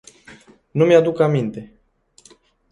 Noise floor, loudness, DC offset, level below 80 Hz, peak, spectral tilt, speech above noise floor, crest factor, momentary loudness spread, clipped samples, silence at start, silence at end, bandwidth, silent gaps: -54 dBFS; -17 LUFS; under 0.1%; -60 dBFS; -2 dBFS; -7.5 dB/octave; 38 dB; 18 dB; 14 LU; under 0.1%; 0.75 s; 1.05 s; 10.5 kHz; none